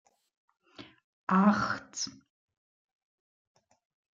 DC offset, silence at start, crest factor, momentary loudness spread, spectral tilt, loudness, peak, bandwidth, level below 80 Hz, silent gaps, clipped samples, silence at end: under 0.1%; 0.8 s; 22 dB; 13 LU; -5 dB/octave; -29 LUFS; -12 dBFS; 7.6 kHz; -70 dBFS; 1.04-1.27 s; under 0.1%; 2.05 s